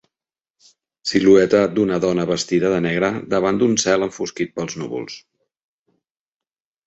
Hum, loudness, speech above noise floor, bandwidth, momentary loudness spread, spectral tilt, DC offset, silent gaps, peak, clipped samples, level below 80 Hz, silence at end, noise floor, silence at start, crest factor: none; -18 LUFS; over 72 dB; 8.2 kHz; 14 LU; -4.5 dB/octave; under 0.1%; none; -2 dBFS; under 0.1%; -54 dBFS; 1.7 s; under -90 dBFS; 1.05 s; 18 dB